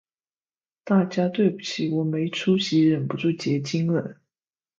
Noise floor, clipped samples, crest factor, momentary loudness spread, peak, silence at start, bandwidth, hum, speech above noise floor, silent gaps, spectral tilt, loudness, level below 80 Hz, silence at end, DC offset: under -90 dBFS; under 0.1%; 16 dB; 6 LU; -8 dBFS; 0.85 s; 7.6 kHz; none; over 67 dB; none; -6.5 dB/octave; -23 LUFS; -68 dBFS; 0.65 s; under 0.1%